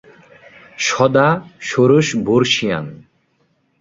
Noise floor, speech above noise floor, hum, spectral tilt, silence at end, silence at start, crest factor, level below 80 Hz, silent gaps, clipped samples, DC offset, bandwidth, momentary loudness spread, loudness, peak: -62 dBFS; 47 dB; none; -5 dB/octave; 0.85 s; 0.8 s; 16 dB; -54 dBFS; none; under 0.1%; under 0.1%; 8 kHz; 9 LU; -16 LUFS; 0 dBFS